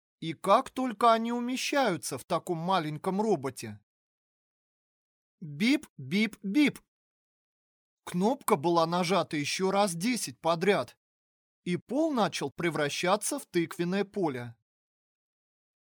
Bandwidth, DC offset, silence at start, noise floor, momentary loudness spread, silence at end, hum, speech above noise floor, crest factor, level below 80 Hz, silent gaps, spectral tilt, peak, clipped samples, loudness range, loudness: over 20 kHz; under 0.1%; 0.2 s; under -90 dBFS; 10 LU; 1.35 s; none; over 61 dB; 20 dB; -76 dBFS; 2.24-2.28 s, 3.83-5.38 s, 5.90-5.96 s, 6.88-7.97 s, 10.97-11.63 s, 11.82-11.87 s; -4.5 dB/octave; -10 dBFS; under 0.1%; 5 LU; -29 LUFS